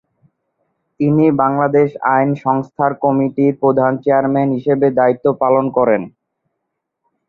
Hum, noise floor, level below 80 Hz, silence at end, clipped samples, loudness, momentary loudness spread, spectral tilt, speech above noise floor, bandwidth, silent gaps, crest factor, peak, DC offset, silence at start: none; -75 dBFS; -58 dBFS; 1.2 s; under 0.1%; -15 LUFS; 4 LU; -11 dB/octave; 61 dB; 4.2 kHz; none; 14 dB; -2 dBFS; under 0.1%; 1 s